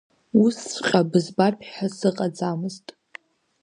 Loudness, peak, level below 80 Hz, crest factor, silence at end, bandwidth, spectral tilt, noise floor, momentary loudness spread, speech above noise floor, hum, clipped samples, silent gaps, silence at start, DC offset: -23 LUFS; -2 dBFS; -68 dBFS; 20 dB; 0.85 s; 10.5 kHz; -5.5 dB/octave; -48 dBFS; 11 LU; 25 dB; none; under 0.1%; none; 0.35 s; under 0.1%